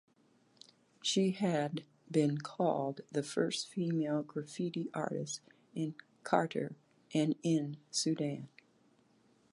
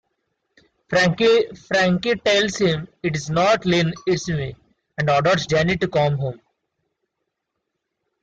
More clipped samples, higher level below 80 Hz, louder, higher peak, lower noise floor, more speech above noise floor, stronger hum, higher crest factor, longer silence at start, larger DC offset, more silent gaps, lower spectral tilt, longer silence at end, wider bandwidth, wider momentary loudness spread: neither; second, -84 dBFS vs -50 dBFS; second, -36 LUFS vs -20 LUFS; second, -14 dBFS vs -6 dBFS; second, -69 dBFS vs -79 dBFS; second, 35 dB vs 59 dB; neither; first, 24 dB vs 14 dB; first, 1.05 s vs 0.9 s; neither; neither; about the same, -5 dB/octave vs -5 dB/octave; second, 1.05 s vs 1.85 s; first, 11.5 kHz vs 9 kHz; about the same, 10 LU vs 9 LU